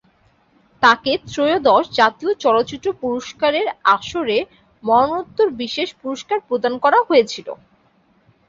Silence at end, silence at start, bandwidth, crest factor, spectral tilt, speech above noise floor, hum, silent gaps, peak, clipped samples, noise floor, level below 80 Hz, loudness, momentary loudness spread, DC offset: 0.95 s; 0.8 s; 7.8 kHz; 18 dB; -4 dB/octave; 40 dB; none; none; 0 dBFS; under 0.1%; -58 dBFS; -56 dBFS; -18 LUFS; 10 LU; under 0.1%